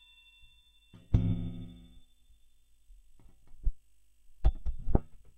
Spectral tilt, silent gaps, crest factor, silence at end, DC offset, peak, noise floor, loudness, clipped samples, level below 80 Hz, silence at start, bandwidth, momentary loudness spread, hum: -9.5 dB/octave; none; 26 dB; 0.2 s; under 0.1%; -8 dBFS; -61 dBFS; -35 LUFS; under 0.1%; -36 dBFS; 1.1 s; 3.8 kHz; 23 LU; none